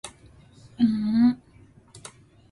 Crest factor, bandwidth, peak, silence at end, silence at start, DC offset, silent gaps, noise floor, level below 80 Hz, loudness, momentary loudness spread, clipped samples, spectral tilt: 16 dB; 11.5 kHz; -10 dBFS; 0.4 s; 0.05 s; under 0.1%; none; -54 dBFS; -58 dBFS; -23 LUFS; 24 LU; under 0.1%; -6 dB/octave